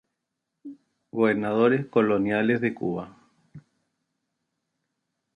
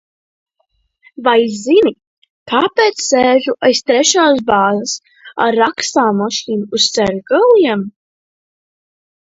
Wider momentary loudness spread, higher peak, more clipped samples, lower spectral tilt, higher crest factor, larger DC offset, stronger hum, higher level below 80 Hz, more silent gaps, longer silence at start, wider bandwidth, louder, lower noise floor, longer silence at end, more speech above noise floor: first, 23 LU vs 9 LU; second, -8 dBFS vs 0 dBFS; neither; first, -8.5 dB/octave vs -3 dB/octave; first, 20 dB vs 14 dB; neither; neither; second, -66 dBFS vs -54 dBFS; second, none vs 2.07-2.22 s, 2.30-2.46 s; second, 0.65 s vs 1.2 s; first, 9.4 kHz vs 8 kHz; second, -24 LUFS vs -13 LUFS; first, -83 dBFS vs -64 dBFS; first, 1.75 s vs 1.45 s; first, 59 dB vs 52 dB